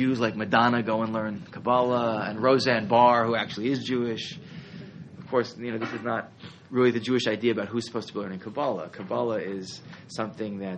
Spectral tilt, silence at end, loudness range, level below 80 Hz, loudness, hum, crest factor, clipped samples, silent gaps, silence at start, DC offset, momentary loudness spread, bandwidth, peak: -6 dB/octave; 0 s; 7 LU; -68 dBFS; -26 LUFS; none; 20 dB; under 0.1%; none; 0 s; under 0.1%; 18 LU; 8.8 kHz; -6 dBFS